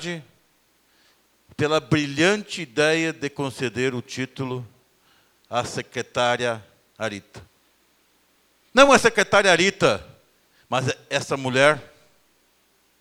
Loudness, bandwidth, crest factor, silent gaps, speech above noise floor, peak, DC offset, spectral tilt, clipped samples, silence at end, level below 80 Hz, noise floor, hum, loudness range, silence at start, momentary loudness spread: -21 LUFS; 19.5 kHz; 24 dB; none; 42 dB; 0 dBFS; under 0.1%; -4 dB/octave; under 0.1%; 1.15 s; -56 dBFS; -63 dBFS; none; 9 LU; 0 s; 14 LU